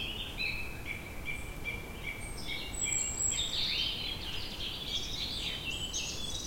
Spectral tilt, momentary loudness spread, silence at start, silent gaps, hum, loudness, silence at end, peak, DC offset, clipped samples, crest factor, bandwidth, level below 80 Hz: -1 dB/octave; 10 LU; 0 s; none; none; -34 LUFS; 0 s; -20 dBFS; under 0.1%; under 0.1%; 16 dB; 16.5 kHz; -46 dBFS